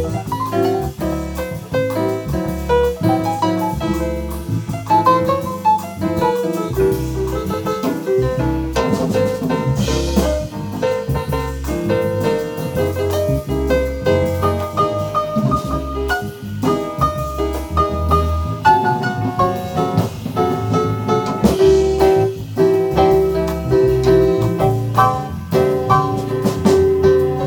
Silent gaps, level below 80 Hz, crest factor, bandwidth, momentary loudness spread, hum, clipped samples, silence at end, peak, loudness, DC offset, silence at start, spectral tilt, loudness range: none; -30 dBFS; 16 dB; 19.5 kHz; 8 LU; none; under 0.1%; 0 s; 0 dBFS; -18 LUFS; under 0.1%; 0 s; -7 dB/octave; 4 LU